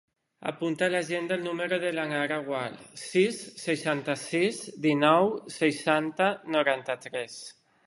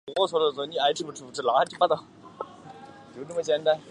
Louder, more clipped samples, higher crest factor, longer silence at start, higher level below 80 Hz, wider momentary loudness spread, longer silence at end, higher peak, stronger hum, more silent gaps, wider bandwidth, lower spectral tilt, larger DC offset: about the same, -28 LUFS vs -26 LUFS; neither; about the same, 22 dB vs 20 dB; first, 0.4 s vs 0.05 s; second, -78 dBFS vs -72 dBFS; second, 11 LU vs 20 LU; first, 0.35 s vs 0 s; about the same, -6 dBFS vs -6 dBFS; neither; neither; about the same, 11.5 kHz vs 11 kHz; about the same, -4.5 dB/octave vs -3.5 dB/octave; neither